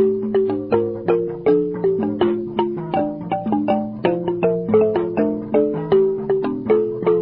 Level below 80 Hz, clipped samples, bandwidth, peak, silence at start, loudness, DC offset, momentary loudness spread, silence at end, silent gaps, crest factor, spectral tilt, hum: -52 dBFS; under 0.1%; 5.2 kHz; -4 dBFS; 0 s; -20 LUFS; under 0.1%; 5 LU; 0 s; none; 14 dB; -11.5 dB/octave; none